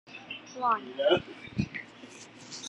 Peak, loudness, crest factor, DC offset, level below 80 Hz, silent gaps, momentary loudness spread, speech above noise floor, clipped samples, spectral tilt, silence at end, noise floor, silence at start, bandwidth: -10 dBFS; -31 LUFS; 22 dB; under 0.1%; -60 dBFS; none; 21 LU; 20 dB; under 0.1%; -4.5 dB/octave; 0 s; -49 dBFS; 0.05 s; 10.5 kHz